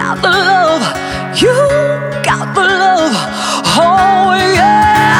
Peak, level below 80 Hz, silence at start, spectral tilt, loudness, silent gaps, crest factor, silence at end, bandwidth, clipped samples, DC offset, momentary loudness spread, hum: 0 dBFS; -38 dBFS; 0 s; -4 dB/octave; -10 LUFS; none; 10 dB; 0 s; 18.5 kHz; under 0.1%; under 0.1%; 7 LU; none